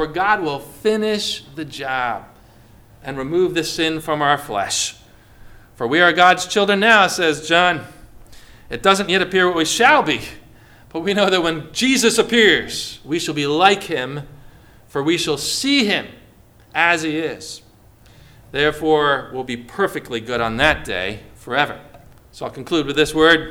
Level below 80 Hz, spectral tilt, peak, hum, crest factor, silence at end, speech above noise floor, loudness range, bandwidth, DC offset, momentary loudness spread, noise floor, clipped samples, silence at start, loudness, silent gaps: -46 dBFS; -3 dB/octave; 0 dBFS; none; 20 dB; 0 s; 30 dB; 6 LU; 18 kHz; under 0.1%; 15 LU; -48 dBFS; under 0.1%; 0 s; -17 LUFS; none